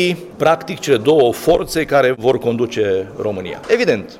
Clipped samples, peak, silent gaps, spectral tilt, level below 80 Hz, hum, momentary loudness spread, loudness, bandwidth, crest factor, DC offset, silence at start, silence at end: under 0.1%; -4 dBFS; none; -5 dB/octave; -44 dBFS; none; 7 LU; -16 LUFS; 16.5 kHz; 12 dB; under 0.1%; 0 s; 0 s